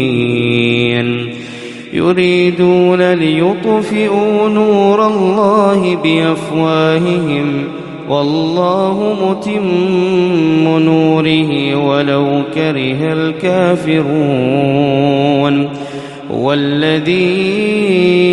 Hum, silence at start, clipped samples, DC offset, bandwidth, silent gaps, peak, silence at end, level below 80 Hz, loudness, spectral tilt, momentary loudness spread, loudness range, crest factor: none; 0 s; under 0.1%; under 0.1%; 11.5 kHz; none; 0 dBFS; 0 s; -52 dBFS; -12 LUFS; -7 dB/octave; 6 LU; 2 LU; 12 dB